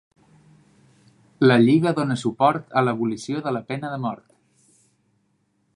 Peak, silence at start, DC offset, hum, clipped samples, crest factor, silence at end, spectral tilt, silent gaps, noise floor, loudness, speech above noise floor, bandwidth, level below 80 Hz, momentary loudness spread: -2 dBFS; 1.4 s; under 0.1%; none; under 0.1%; 20 dB; 1.6 s; -7 dB/octave; none; -68 dBFS; -21 LUFS; 48 dB; 11 kHz; -68 dBFS; 13 LU